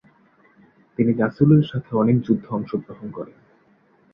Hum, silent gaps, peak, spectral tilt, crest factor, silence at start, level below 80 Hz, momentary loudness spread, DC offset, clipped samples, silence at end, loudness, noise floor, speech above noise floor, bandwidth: none; none; -4 dBFS; -11 dB/octave; 18 dB; 1 s; -58 dBFS; 19 LU; under 0.1%; under 0.1%; 0.9 s; -20 LUFS; -58 dBFS; 38 dB; 5.4 kHz